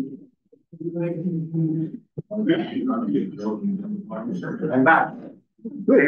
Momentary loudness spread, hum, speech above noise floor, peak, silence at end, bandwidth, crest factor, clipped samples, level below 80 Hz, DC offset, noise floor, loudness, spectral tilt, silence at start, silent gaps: 18 LU; none; 33 dB; -4 dBFS; 0 s; 6.6 kHz; 18 dB; under 0.1%; -72 dBFS; under 0.1%; -55 dBFS; -24 LUFS; -9 dB/octave; 0 s; none